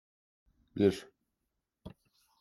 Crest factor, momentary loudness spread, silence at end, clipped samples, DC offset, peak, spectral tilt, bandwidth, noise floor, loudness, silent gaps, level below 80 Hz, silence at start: 24 dB; 24 LU; 0.5 s; under 0.1%; under 0.1%; -14 dBFS; -7 dB/octave; 13 kHz; -85 dBFS; -31 LUFS; none; -68 dBFS; 0.75 s